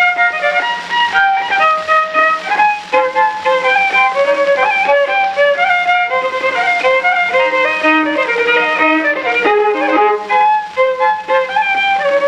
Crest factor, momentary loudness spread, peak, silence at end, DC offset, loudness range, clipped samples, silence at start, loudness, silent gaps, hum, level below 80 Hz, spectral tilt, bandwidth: 12 dB; 3 LU; 0 dBFS; 0 s; under 0.1%; 1 LU; under 0.1%; 0 s; -12 LUFS; none; none; -58 dBFS; -3 dB/octave; 9.8 kHz